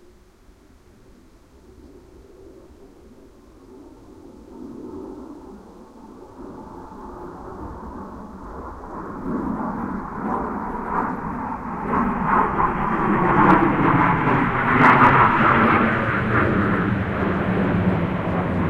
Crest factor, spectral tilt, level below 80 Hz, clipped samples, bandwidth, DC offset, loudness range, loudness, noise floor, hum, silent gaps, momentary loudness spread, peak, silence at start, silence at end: 22 dB; -8.5 dB/octave; -40 dBFS; under 0.1%; 9.8 kHz; under 0.1%; 24 LU; -19 LUFS; -51 dBFS; none; none; 22 LU; 0 dBFS; 1.85 s; 0 s